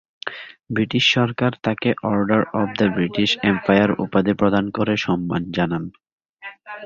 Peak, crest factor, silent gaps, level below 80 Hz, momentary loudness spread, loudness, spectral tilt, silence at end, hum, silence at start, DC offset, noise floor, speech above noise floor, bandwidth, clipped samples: -2 dBFS; 18 dB; 6.13-6.18 s, 6.29-6.35 s; -50 dBFS; 15 LU; -20 LUFS; -6 dB/octave; 0 s; none; 0.25 s; under 0.1%; -41 dBFS; 21 dB; 7.6 kHz; under 0.1%